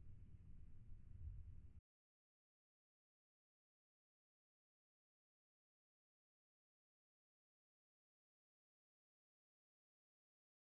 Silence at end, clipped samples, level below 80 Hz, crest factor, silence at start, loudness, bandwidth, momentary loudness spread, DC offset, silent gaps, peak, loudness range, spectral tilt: 8.9 s; under 0.1%; -68 dBFS; 20 dB; 0 s; -63 LUFS; 2.8 kHz; 7 LU; under 0.1%; none; -44 dBFS; 2 LU; -11 dB/octave